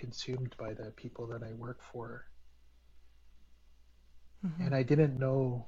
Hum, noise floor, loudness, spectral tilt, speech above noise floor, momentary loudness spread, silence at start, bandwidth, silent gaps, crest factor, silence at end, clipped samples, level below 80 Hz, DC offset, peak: none; -60 dBFS; -35 LUFS; -7.5 dB/octave; 25 dB; 17 LU; 0 s; 7.4 kHz; none; 22 dB; 0 s; under 0.1%; -60 dBFS; under 0.1%; -16 dBFS